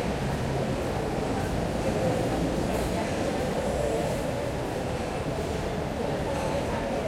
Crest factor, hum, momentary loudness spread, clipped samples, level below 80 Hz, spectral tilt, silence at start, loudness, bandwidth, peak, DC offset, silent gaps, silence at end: 14 dB; none; 3 LU; under 0.1%; -40 dBFS; -6 dB/octave; 0 s; -29 LUFS; 16.5 kHz; -14 dBFS; under 0.1%; none; 0 s